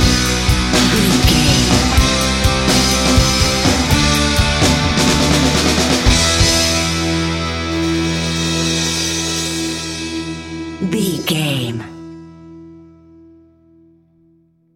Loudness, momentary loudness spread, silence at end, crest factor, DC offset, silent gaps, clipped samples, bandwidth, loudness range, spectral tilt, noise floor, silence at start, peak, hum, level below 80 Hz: -14 LUFS; 10 LU; 2 s; 16 dB; under 0.1%; none; under 0.1%; 16.5 kHz; 10 LU; -3.5 dB/octave; -54 dBFS; 0 s; 0 dBFS; none; -24 dBFS